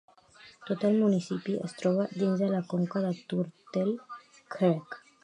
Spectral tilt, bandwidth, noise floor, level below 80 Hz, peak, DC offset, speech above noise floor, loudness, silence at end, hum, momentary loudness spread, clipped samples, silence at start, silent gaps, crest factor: -8 dB/octave; 10 kHz; -56 dBFS; -78 dBFS; -12 dBFS; under 0.1%; 27 dB; -30 LUFS; 0.25 s; none; 15 LU; under 0.1%; 0.45 s; none; 18 dB